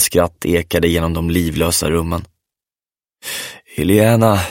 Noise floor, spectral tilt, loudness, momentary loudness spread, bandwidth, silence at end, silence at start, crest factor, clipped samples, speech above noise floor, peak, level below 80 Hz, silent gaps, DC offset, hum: under -90 dBFS; -5 dB/octave; -16 LUFS; 13 LU; 17 kHz; 0 s; 0 s; 16 dB; under 0.1%; over 75 dB; 0 dBFS; -34 dBFS; none; under 0.1%; none